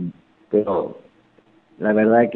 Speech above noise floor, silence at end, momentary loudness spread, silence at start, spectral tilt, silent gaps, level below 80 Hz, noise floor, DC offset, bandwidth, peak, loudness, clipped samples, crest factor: 38 dB; 0 s; 15 LU; 0 s; -11 dB/octave; none; -62 dBFS; -56 dBFS; under 0.1%; 4.1 kHz; -4 dBFS; -20 LUFS; under 0.1%; 18 dB